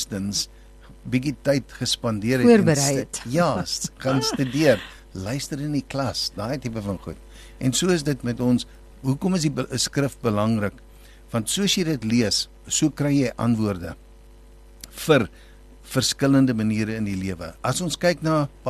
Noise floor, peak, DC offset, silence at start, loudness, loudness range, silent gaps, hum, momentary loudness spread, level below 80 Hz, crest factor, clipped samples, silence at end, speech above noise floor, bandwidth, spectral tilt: -47 dBFS; -2 dBFS; under 0.1%; 0 s; -23 LUFS; 4 LU; none; none; 11 LU; -46 dBFS; 20 dB; under 0.1%; 0 s; 24 dB; 13 kHz; -4.5 dB/octave